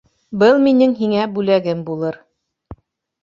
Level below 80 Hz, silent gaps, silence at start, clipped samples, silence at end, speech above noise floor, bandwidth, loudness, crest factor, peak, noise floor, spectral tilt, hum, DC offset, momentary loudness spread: -54 dBFS; none; 0.3 s; under 0.1%; 0.5 s; 26 dB; 7.4 kHz; -16 LUFS; 16 dB; -2 dBFS; -41 dBFS; -7.5 dB/octave; none; under 0.1%; 13 LU